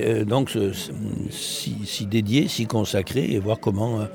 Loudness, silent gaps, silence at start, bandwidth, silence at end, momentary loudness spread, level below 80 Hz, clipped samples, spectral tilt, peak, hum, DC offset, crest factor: -24 LUFS; none; 0 s; 19.5 kHz; 0 s; 7 LU; -56 dBFS; under 0.1%; -5.5 dB/octave; -6 dBFS; none; under 0.1%; 16 dB